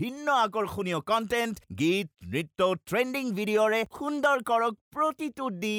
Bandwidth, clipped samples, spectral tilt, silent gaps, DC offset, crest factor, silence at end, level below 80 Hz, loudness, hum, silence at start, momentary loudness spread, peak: 19 kHz; under 0.1%; -5 dB/octave; 4.81-4.91 s; under 0.1%; 16 dB; 0 s; -62 dBFS; -28 LUFS; none; 0 s; 8 LU; -12 dBFS